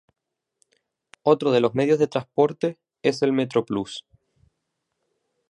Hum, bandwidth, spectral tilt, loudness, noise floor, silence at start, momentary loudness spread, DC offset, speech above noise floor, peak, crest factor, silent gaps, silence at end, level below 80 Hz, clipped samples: none; 10.5 kHz; -6.5 dB/octave; -23 LUFS; -78 dBFS; 1.25 s; 9 LU; under 0.1%; 57 dB; -4 dBFS; 20 dB; none; 1.5 s; -66 dBFS; under 0.1%